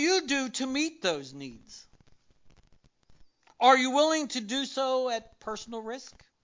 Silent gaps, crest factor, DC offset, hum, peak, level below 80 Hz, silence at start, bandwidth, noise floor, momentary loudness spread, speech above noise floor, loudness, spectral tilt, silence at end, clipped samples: none; 22 dB; under 0.1%; none; -8 dBFS; -68 dBFS; 0 s; 7.8 kHz; -62 dBFS; 21 LU; 33 dB; -28 LUFS; -2 dB/octave; 0.35 s; under 0.1%